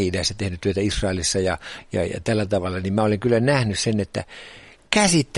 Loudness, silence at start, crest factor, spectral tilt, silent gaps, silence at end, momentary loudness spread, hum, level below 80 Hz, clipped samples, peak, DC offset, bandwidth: -22 LUFS; 0 s; 22 dB; -4.5 dB/octave; none; 0 s; 11 LU; none; -42 dBFS; under 0.1%; -2 dBFS; under 0.1%; 11.5 kHz